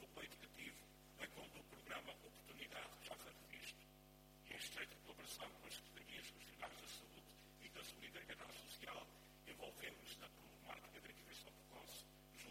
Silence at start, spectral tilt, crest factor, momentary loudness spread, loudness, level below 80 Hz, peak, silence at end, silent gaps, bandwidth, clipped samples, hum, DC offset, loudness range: 0 s; -2 dB/octave; 22 dB; 9 LU; -56 LUFS; -74 dBFS; -36 dBFS; 0 s; none; 16.5 kHz; under 0.1%; none; under 0.1%; 2 LU